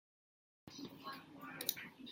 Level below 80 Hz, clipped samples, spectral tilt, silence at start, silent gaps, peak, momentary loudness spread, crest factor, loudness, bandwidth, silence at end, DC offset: -86 dBFS; under 0.1%; -2 dB/octave; 0.65 s; none; -16 dBFS; 14 LU; 36 dB; -46 LUFS; 16.5 kHz; 0 s; under 0.1%